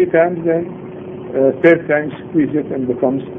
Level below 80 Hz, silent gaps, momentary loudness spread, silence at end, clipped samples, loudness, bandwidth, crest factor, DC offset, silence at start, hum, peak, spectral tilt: -54 dBFS; none; 16 LU; 0 s; under 0.1%; -16 LUFS; 3.8 kHz; 16 dB; under 0.1%; 0 s; none; 0 dBFS; -10 dB/octave